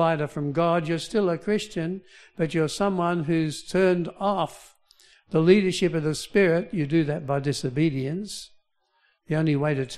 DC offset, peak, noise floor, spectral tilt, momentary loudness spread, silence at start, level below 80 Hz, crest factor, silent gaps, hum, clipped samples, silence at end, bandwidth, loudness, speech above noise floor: under 0.1%; -4 dBFS; -68 dBFS; -6 dB/octave; 9 LU; 0 s; -56 dBFS; 20 dB; none; none; under 0.1%; 0 s; 13.5 kHz; -25 LUFS; 44 dB